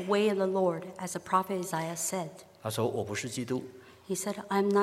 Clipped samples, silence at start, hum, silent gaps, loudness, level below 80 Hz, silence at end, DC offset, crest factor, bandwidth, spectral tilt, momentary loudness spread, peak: under 0.1%; 0 s; none; none; -32 LUFS; -74 dBFS; 0 s; under 0.1%; 18 dB; 16 kHz; -4.5 dB/octave; 10 LU; -12 dBFS